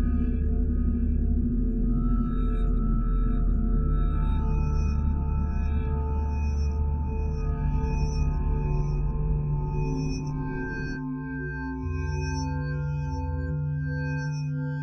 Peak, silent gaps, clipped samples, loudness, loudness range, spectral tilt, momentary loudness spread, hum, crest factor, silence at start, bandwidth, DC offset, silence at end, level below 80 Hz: -14 dBFS; none; under 0.1%; -29 LUFS; 3 LU; -8 dB/octave; 4 LU; none; 12 dB; 0 s; 6.4 kHz; under 0.1%; 0 s; -28 dBFS